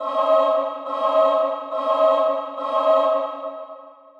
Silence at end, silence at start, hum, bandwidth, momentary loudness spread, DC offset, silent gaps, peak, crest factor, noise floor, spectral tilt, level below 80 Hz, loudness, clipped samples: 0.3 s; 0 s; none; 6.6 kHz; 12 LU; under 0.1%; none; -6 dBFS; 14 dB; -42 dBFS; -3 dB/octave; under -90 dBFS; -20 LUFS; under 0.1%